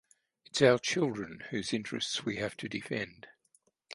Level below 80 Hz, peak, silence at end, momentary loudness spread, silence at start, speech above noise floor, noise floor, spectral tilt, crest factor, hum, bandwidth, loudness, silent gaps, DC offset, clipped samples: -68 dBFS; -10 dBFS; 0.7 s; 13 LU; 0.55 s; 39 dB; -71 dBFS; -4 dB/octave; 24 dB; none; 11.5 kHz; -32 LUFS; none; under 0.1%; under 0.1%